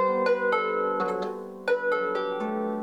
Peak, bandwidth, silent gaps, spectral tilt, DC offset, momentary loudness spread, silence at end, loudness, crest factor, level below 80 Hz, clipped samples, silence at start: -14 dBFS; 9.2 kHz; none; -6 dB/octave; under 0.1%; 7 LU; 0 s; -27 LUFS; 14 dB; -76 dBFS; under 0.1%; 0 s